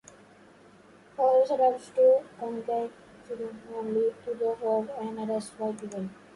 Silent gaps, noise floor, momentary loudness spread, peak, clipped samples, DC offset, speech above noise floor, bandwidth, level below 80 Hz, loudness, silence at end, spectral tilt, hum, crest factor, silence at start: none; -55 dBFS; 15 LU; -12 dBFS; under 0.1%; under 0.1%; 27 dB; 11.5 kHz; -72 dBFS; -28 LUFS; 0.25 s; -6 dB/octave; none; 16 dB; 1.2 s